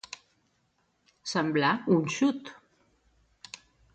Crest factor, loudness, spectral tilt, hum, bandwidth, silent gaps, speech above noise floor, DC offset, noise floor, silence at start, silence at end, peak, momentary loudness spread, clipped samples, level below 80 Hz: 20 dB; -27 LUFS; -5 dB/octave; none; 9 kHz; none; 46 dB; under 0.1%; -73 dBFS; 0.1 s; 1.4 s; -12 dBFS; 21 LU; under 0.1%; -70 dBFS